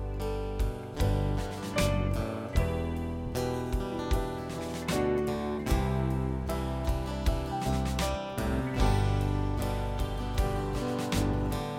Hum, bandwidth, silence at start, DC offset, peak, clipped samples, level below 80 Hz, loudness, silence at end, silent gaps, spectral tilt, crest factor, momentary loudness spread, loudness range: none; 16.5 kHz; 0 s; under 0.1%; -12 dBFS; under 0.1%; -34 dBFS; -31 LUFS; 0 s; none; -6 dB/octave; 18 dB; 5 LU; 1 LU